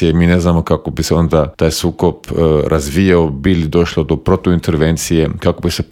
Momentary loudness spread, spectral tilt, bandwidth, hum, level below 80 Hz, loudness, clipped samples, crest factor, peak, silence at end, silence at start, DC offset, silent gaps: 5 LU; -6 dB/octave; 16.5 kHz; none; -30 dBFS; -14 LUFS; under 0.1%; 12 dB; 0 dBFS; 0.05 s; 0 s; under 0.1%; none